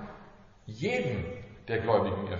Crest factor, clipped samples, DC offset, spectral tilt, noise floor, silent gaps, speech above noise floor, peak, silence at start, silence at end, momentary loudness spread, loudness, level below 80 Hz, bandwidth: 18 dB; under 0.1%; under 0.1%; -5.5 dB/octave; -53 dBFS; none; 23 dB; -14 dBFS; 0 s; 0 s; 21 LU; -31 LUFS; -56 dBFS; 7.4 kHz